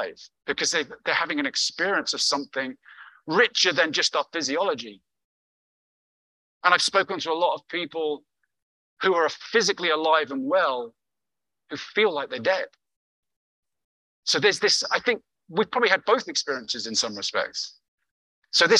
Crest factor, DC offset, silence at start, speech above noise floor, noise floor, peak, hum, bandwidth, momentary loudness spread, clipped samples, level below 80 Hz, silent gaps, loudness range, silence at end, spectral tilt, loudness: 22 dB; under 0.1%; 0 s; 65 dB; -89 dBFS; -4 dBFS; none; 12 kHz; 11 LU; under 0.1%; -74 dBFS; 5.24-6.61 s, 8.62-8.97 s, 12.96-13.23 s, 13.36-13.63 s, 13.84-14.23 s, 17.88-17.98 s, 18.11-18.42 s; 3 LU; 0 s; -1.5 dB/octave; -24 LUFS